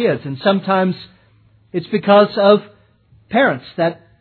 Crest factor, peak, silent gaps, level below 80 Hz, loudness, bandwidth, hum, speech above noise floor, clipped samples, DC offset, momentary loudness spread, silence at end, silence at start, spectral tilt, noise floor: 16 dB; 0 dBFS; none; -62 dBFS; -16 LUFS; 4.6 kHz; none; 37 dB; under 0.1%; under 0.1%; 10 LU; 0.25 s; 0 s; -9.5 dB/octave; -52 dBFS